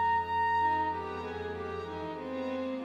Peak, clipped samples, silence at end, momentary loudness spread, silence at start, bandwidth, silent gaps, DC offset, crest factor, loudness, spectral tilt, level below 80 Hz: -20 dBFS; under 0.1%; 0 s; 10 LU; 0 s; 8 kHz; none; under 0.1%; 12 dB; -33 LUFS; -6.5 dB/octave; -60 dBFS